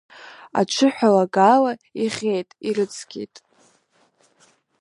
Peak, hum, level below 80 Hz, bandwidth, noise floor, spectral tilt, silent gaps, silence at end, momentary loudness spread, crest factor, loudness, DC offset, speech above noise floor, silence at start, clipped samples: -2 dBFS; none; -72 dBFS; 11.5 kHz; -62 dBFS; -5 dB/octave; none; 1.55 s; 19 LU; 20 dB; -20 LUFS; under 0.1%; 42 dB; 0.2 s; under 0.1%